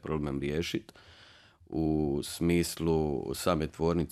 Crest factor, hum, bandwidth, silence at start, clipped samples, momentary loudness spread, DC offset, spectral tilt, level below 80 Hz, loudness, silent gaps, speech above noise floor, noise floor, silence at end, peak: 18 dB; none; 14.5 kHz; 0.05 s; under 0.1%; 5 LU; under 0.1%; -6 dB/octave; -48 dBFS; -31 LUFS; none; 27 dB; -57 dBFS; 0.05 s; -12 dBFS